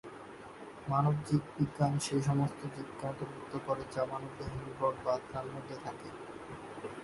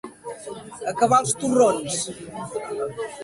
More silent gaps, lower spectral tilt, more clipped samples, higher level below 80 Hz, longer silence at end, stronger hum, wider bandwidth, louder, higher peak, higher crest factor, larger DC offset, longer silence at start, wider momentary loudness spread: neither; first, -6.5 dB/octave vs -4 dB/octave; neither; about the same, -60 dBFS vs -60 dBFS; about the same, 0 s vs 0 s; neither; about the same, 11.5 kHz vs 11.5 kHz; second, -36 LUFS vs -23 LUFS; second, -16 dBFS vs -6 dBFS; about the same, 20 dB vs 18 dB; neither; about the same, 0.05 s vs 0.05 s; second, 15 LU vs 18 LU